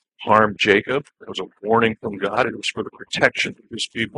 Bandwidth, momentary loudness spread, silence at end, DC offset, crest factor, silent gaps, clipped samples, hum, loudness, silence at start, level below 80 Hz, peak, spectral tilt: 11 kHz; 13 LU; 0 s; under 0.1%; 20 dB; none; under 0.1%; none; -20 LUFS; 0.2 s; -58 dBFS; 0 dBFS; -4 dB/octave